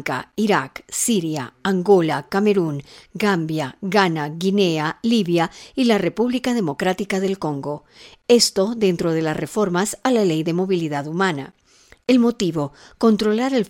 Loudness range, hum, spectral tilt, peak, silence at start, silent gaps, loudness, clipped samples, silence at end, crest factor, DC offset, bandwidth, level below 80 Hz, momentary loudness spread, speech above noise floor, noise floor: 1 LU; none; -5 dB/octave; 0 dBFS; 0 s; none; -20 LUFS; under 0.1%; 0 s; 20 dB; under 0.1%; 16.5 kHz; -56 dBFS; 9 LU; 22 dB; -42 dBFS